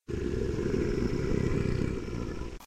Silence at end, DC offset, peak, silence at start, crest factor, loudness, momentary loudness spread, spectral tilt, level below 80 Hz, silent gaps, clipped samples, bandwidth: 0 s; 0.5%; -16 dBFS; 0 s; 16 dB; -32 LUFS; 7 LU; -7.5 dB/octave; -38 dBFS; none; under 0.1%; 13.5 kHz